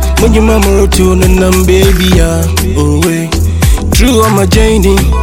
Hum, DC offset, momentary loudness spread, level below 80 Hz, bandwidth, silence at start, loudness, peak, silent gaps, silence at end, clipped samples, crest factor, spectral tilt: none; under 0.1%; 4 LU; -12 dBFS; 17.5 kHz; 0 s; -8 LUFS; 0 dBFS; none; 0 s; 4%; 6 dB; -5.5 dB/octave